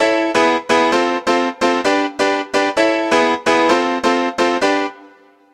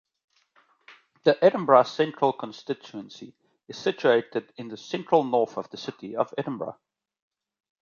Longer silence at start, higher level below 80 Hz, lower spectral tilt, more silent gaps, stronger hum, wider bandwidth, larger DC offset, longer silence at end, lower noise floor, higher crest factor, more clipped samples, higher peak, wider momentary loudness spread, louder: second, 0 s vs 1.25 s; first, -56 dBFS vs -78 dBFS; second, -3 dB/octave vs -6 dB/octave; neither; neither; first, 13.5 kHz vs 7.2 kHz; neither; second, 0.5 s vs 1.1 s; second, -46 dBFS vs -64 dBFS; second, 16 dB vs 24 dB; neither; about the same, 0 dBFS vs -2 dBFS; second, 3 LU vs 20 LU; first, -16 LUFS vs -25 LUFS